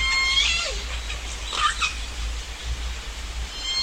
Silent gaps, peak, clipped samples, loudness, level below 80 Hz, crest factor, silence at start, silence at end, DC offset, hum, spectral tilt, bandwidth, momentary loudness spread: none; -8 dBFS; under 0.1%; -25 LUFS; -32 dBFS; 18 dB; 0 s; 0 s; under 0.1%; none; -1 dB/octave; 16 kHz; 14 LU